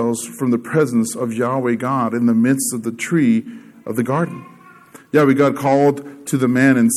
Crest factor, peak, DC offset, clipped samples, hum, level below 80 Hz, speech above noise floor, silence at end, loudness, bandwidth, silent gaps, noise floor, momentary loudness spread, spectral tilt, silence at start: 16 dB; -2 dBFS; under 0.1%; under 0.1%; none; -66 dBFS; 27 dB; 0 s; -17 LUFS; 15 kHz; none; -44 dBFS; 9 LU; -6 dB/octave; 0 s